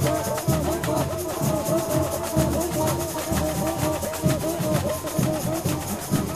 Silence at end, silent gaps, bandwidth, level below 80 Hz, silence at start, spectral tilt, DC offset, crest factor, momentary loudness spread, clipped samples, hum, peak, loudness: 0 s; none; 16 kHz; -40 dBFS; 0 s; -5.5 dB/octave; under 0.1%; 16 dB; 3 LU; under 0.1%; none; -8 dBFS; -25 LUFS